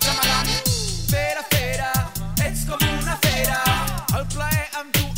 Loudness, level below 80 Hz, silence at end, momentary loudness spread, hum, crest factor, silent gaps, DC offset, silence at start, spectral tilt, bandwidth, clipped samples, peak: -21 LUFS; -30 dBFS; 0 s; 5 LU; none; 18 dB; none; 0.3%; 0 s; -3.5 dB/octave; 16.5 kHz; under 0.1%; -2 dBFS